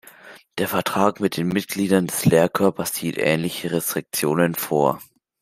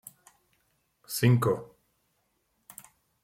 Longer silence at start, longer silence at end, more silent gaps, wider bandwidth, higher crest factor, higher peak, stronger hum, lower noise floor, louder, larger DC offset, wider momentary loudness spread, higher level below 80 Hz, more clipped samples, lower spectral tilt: second, 0.25 s vs 1.1 s; second, 0.4 s vs 1.6 s; neither; about the same, 16 kHz vs 16.5 kHz; about the same, 20 dB vs 22 dB; first, -2 dBFS vs -10 dBFS; neither; second, -46 dBFS vs -75 dBFS; first, -21 LUFS vs -27 LUFS; neither; second, 7 LU vs 26 LU; first, -58 dBFS vs -68 dBFS; neither; about the same, -5 dB/octave vs -6 dB/octave